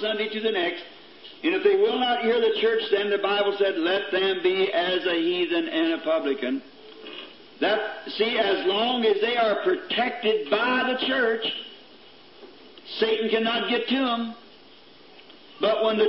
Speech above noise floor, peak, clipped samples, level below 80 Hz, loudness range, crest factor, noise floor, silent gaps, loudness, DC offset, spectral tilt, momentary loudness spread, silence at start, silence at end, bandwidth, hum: 27 dB; -8 dBFS; under 0.1%; -78 dBFS; 4 LU; 16 dB; -51 dBFS; none; -24 LUFS; 0.2%; -8 dB/octave; 12 LU; 0 s; 0 s; 5.8 kHz; none